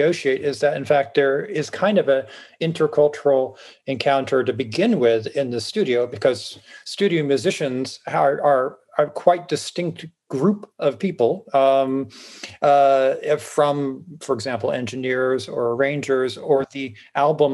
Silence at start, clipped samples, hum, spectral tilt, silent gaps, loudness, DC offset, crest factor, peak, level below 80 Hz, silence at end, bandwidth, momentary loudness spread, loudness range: 0 s; under 0.1%; none; -5.5 dB/octave; none; -21 LUFS; under 0.1%; 20 dB; -2 dBFS; -72 dBFS; 0 s; 12 kHz; 11 LU; 3 LU